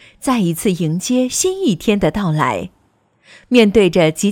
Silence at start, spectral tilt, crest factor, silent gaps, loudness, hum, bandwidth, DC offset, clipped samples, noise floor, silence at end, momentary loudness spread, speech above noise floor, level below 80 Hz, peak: 0.2 s; -5 dB/octave; 16 dB; none; -15 LUFS; none; 17.5 kHz; under 0.1%; under 0.1%; -58 dBFS; 0 s; 7 LU; 43 dB; -42 dBFS; 0 dBFS